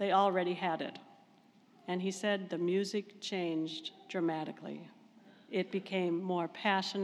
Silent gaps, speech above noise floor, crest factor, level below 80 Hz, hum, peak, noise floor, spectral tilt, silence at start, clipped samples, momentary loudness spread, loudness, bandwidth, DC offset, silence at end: none; 30 dB; 20 dB; under -90 dBFS; none; -16 dBFS; -64 dBFS; -5 dB/octave; 0 s; under 0.1%; 11 LU; -35 LUFS; 12 kHz; under 0.1%; 0 s